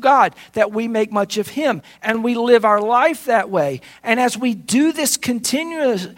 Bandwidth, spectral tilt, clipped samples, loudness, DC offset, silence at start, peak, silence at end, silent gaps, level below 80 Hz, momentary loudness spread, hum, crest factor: 16.5 kHz; -3.5 dB/octave; under 0.1%; -18 LUFS; under 0.1%; 0 s; 0 dBFS; 0.05 s; none; -62 dBFS; 7 LU; none; 18 dB